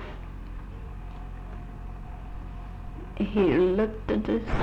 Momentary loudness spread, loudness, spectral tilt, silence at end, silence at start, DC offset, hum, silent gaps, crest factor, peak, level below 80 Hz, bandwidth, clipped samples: 18 LU; -26 LUFS; -8.5 dB/octave; 0 s; 0 s; under 0.1%; none; none; 16 dB; -12 dBFS; -38 dBFS; 7.6 kHz; under 0.1%